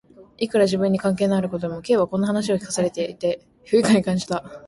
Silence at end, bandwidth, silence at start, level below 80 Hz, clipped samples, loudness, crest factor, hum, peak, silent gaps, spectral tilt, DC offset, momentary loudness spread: 0.1 s; 11.5 kHz; 0.2 s; -56 dBFS; under 0.1%; -22 LUFS; 16 dB; none; -6 dBFS; none; -5.5 dB/octave; under 0.1%; 8 LU